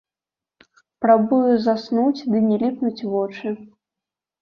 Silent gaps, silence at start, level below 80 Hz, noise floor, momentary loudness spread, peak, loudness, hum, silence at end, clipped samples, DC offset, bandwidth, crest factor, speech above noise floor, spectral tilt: none; 1 s; -66 dBFS; -90 dBFS; 11 LU; -2 dBFS; -20 LUFS; none; 0.75 s; under 0.1%; under 0.1%; 6.4 kHz; 18 dB; 71 dB; -8 dB/octave